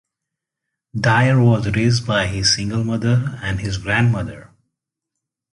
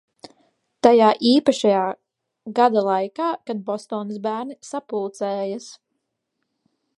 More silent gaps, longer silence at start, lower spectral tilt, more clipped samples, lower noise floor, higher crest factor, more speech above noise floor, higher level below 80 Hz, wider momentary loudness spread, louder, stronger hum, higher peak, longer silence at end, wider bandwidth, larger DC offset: neither; about the same, 0.95 s vs 0.85 s; about the same, -5 dB/octave vs -5 dB/octave; neither; first, -83 dBFS vs -77 dBFS; second, 16 dB vs 22 dB; first, 65 dB vs 57 dB; first, -40 dBFS vs -70 dBFS; second, 10 LU vs 15 LU; first, -18 LUFS vs -21 LUFS; neither; second, -4 dBFS vs 0 dBFS; about the same, 1.1 s vs 1.2 s; about the same, 11 kHz vs 11.5 kHz; neither